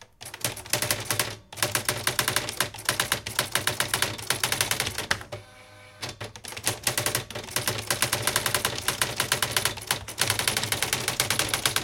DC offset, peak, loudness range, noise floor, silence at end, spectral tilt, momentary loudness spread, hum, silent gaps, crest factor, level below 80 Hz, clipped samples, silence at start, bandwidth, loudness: under 0.1%; 0 dBFS; 3 LU; -49 dBFS; 0 s; -1.5 dB/octave; 7 LU; none; none; 28 dB; -52 dBFS; under 0.1%; 0 s; 17 kHz; -26 LUFS